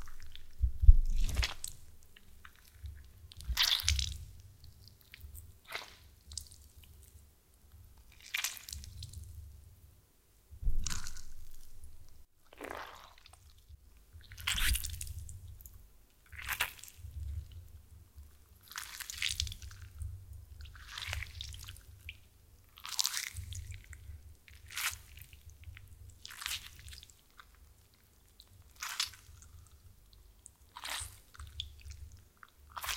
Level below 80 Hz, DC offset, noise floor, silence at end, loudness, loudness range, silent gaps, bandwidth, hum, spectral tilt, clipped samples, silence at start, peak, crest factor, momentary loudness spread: -40 dBFS; under 0.1%; -66 dBFS; 0 s; -38 LUFS; 11 LU; none; 17 kHz; none; -1.5 dB/octave; under 0.1%; 0 s; -6 dBFS; 32 dB; 25 LU